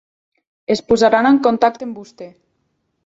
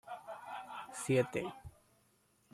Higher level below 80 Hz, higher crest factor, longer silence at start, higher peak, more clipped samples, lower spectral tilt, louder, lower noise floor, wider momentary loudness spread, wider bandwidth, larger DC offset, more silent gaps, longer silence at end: first, -54 dBFS vs -68 dBFS; second, 16 dB vs 22 dB; first, 0.7 s vs 0.05 s; first, -2 dBFS vs -20 dBFS; neither; about the same, -5 dB/octave vs -5.5 dB/octave; first, -15 LUFS vs -39 LUFS; second, -68 dBFS vs -73 dBFS; first, 21 LU vs 18 LU; second, 8 kHz vs 14.5 kHz; neither; neither; about the same, 0.75 s vs 0.85 s